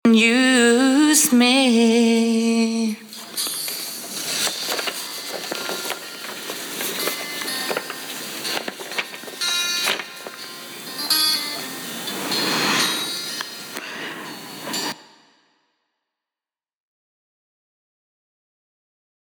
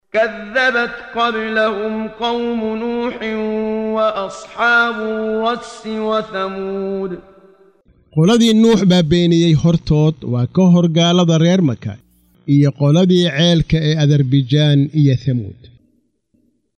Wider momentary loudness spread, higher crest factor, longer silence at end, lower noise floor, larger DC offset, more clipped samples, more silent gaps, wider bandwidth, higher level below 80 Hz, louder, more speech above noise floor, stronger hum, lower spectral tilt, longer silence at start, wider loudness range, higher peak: first, 16 LU vs 11 LU; first, 20 dB vs 12 dB; first, 4.3 s vs 1.25 s; first, under -90 dBFS vs -61 dBFS; neither; neither; neither; first, over 20 kHz vs 9.6 kHz; second, -78 dBFS vs -42 dBFS; second, -20 LUFS vs -15 LUFS; first, over 75 dB vs 46 dB; neither; second, -2 dB/octave vs -6.5 dB/octave; about the same, 0.05 s vs 0.15 s; first, 14 LU vs 6 LU; about the same, -2 dBFS vs -2 dBFS